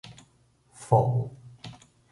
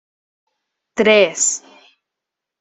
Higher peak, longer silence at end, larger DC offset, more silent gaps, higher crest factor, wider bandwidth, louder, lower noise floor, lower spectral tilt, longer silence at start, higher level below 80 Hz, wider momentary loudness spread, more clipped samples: second, -8 dBFS vs -2 dBFS; second, 0.4 s vs 1.05 s; neither; neither; about the same, 22 dB vs 18 dB; first, 11.5 kHz vs 8.4 kHz; second, -26 LUFS vs -14 LUFS; second, -64 dBFS vs -83 dBFS; first, -7.5 dB/octave vs -1.5 dB/octave; second, 0.05 s vs 0.95 s; about the same, -60 dBFS vs -64 dBFS; first, 24 LU vs 15 LU; neither